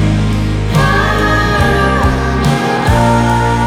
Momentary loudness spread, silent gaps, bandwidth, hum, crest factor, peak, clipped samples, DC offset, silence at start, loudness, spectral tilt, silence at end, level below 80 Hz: 3 LU; none; 15.5 kHz; none; 12 dB; 0 dBFS; under 0.1%; under 0.1%; 0 s; -12 LUFS; -6 dB/octave; 0 s; -20 dBFS